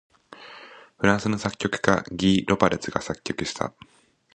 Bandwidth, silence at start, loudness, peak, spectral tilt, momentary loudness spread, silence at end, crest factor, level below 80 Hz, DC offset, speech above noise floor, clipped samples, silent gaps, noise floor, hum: 9.8 kHz; 0.3 s; -24 LUFS; 0 dBFS; -5 dB/octave; 18 LU; 0.65 s; 24 dB; -50 dBFS; under 0.1%; 23 dB; under 0.1%; none; -46 dBFS; none